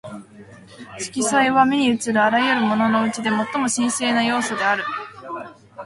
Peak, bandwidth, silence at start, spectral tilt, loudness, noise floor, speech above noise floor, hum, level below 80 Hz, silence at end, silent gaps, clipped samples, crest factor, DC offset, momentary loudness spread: -2 dBFS; 11.5 kHz; 0.05 s; -3 dB/octave; -19 LUFS; -42 dBFS; 23 dB; none; -62 dBFS; 0 s; none; under 0.1%; 18 dB; under 0.1%; 17 LU